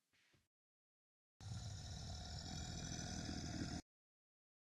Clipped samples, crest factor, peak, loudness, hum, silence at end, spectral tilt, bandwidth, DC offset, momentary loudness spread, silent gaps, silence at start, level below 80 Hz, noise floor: under 0.1%; 18 dB; -32 dBFS; -49 LUFS; none; 0.9 s; -4 dB/octave; 13 kHz; under 0.1%; 5 LU; none; 1.4 s; -60 dBFS; under -90 dBFS